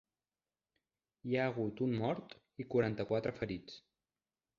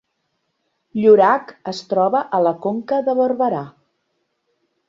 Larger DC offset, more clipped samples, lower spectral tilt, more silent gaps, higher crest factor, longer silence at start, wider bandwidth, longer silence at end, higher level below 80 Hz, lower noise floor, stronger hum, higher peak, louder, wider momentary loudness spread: neither; neither; about the same, -6 dB/octave vs -6.5 dB/octave; neither; about the same, 20 dB vs 18 dB; first, 1.25 s vs 0.95 s; about the same, 7.2 kHz vs 7.6 kHz; second, 0.8 s vs 1.2 s; about the same, -68 dBFS vs -66 dBFS; first, under -90 dBFS vs -72 dBFS; neither; second, -20 dBFS vs -2 dBFS; second, -37 LUFS vs -17 LUFS; about the same, 16 LU vs 17 LU